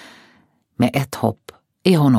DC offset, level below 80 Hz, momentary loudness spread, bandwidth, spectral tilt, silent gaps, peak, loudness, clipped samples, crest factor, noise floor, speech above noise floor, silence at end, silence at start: under 0.1%; -56 dBFS; 7 LU; 16.5 kHz; -7 dB/octave; none; -2 dBFS; -20 LUFS; under 0.1%; 18 dB; -57 dBFS; 41 dB; 0 s; 0.8 s